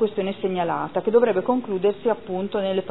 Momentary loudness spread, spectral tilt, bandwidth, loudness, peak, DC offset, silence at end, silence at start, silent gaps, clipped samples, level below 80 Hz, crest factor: 7 LU; -10.5 dB/octave; 4.1 kHz; -23 LUFS; -6 dBFS; 0.5%; 0 s; 0 s; none; under 0.1%; -62 dBFS; 18 dB